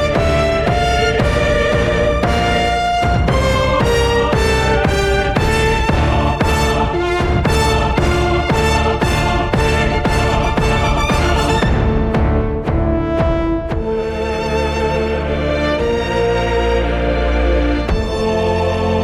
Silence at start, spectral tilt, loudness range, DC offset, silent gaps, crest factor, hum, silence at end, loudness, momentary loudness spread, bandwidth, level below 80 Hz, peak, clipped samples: 0 s; -5.5 dB/octave; 3 LU; under 0.1%; none; 12 dB; none; 0 s; -16 LUFS; 4 LU; 15 kHz; -22 dBFS; -2 dBFS; under 0.1%